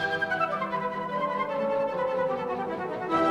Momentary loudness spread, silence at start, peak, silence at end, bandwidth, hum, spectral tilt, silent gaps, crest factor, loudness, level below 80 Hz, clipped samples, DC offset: 4 LU; 0 s; -12 dBFS; 0 s; 11.5 kHz; none; -6 dB/octave; none; 16 dB; -29 LUFS; -62 dBFS; under 0.1%; under 0.1%